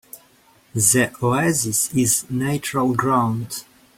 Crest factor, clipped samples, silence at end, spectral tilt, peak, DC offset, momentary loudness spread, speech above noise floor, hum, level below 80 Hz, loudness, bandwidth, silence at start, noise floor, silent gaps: 18 dB; under 0.1%; 0.35 s; -4 dB/octave; -2 dBFS; under 0.1%; 11 LU; 35 dB; none; -54 dBFS; -19 LUFS; 16.5 kHz; 0.15 s; -55 dBFS; none